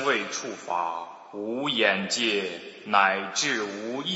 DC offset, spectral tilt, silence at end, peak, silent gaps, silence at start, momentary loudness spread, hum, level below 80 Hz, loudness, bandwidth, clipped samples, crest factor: under 0.1%; -2 dB/octave; 0 s; -4 dBFS; none; 0 s; 13 LU; none; -80 dBFS; -26 LUFS; 8 kHz; under 0.1%; 22 dB